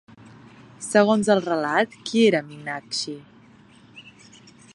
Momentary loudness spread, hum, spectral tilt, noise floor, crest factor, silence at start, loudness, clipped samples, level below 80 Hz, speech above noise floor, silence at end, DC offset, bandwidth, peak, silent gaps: 14 LU; none; -4.5 dB/octave; -51 dBFS; 22 dB; 0.25 s; -22 LUFS; under 0.1%; -68 dBFS; 30 dB; 0.75 s; under 0.1%; 11.5 kHz; -2 dBFS; none